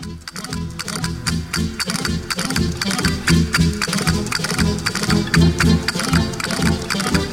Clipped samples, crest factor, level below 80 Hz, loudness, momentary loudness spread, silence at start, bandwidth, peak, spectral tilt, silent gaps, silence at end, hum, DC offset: under 0.1%; 16 dB; -30 dBFS; -19 LUFS; 9 LU; 0 s; 16.5 kHz; -2 dBFS; -4.5 dB/octave; none; 0 s; none; under 0.1%